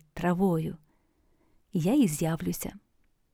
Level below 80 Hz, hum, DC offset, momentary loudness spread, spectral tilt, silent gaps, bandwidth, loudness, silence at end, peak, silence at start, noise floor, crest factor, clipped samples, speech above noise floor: -54 dBFS; none; under 0.1%; 13 LU; -6.5 dB/octave; none; 17 kHz; -28 LUFS; 0.55 s; -14 dBFS; 0.15 s; -68 dBFS; 16 dB; under 0.1%; 41 dB